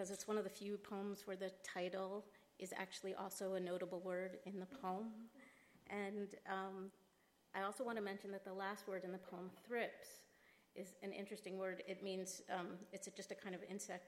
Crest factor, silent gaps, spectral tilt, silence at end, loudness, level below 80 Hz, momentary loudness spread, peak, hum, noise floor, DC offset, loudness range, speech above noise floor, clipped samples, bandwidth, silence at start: 20 dB; none; -4.5 dB/octave; 0 s; -48 LUFS; -90 dBFS; 11 LU; -30 dBFS; none; -77 dBFS; under 0.1%; 2 LU; 29 dB; under 0.1%; 16.5 kHz; 0 s